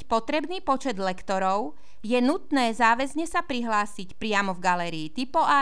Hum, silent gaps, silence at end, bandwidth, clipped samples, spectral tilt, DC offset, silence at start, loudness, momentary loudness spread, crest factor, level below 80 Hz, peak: none; none; 0 s; 11 kHz; under 0.1%; -4 dB/octave; 2%; 0 s; -26 LUFS; 9 LU; 18 dB; -54 dBFS; -8 dBFS